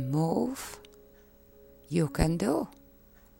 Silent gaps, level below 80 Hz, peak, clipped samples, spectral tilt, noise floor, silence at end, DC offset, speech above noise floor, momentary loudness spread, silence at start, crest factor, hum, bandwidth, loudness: none; -44 dBFS; -12 dBFS; under 0.1%; -6.5 dB/octave; -57 dBFS; 0.65 s; under 0.1%; 29 dB; 14 LU; 0 s; 20 dB; none; 16.5 kHz; -30 LUFS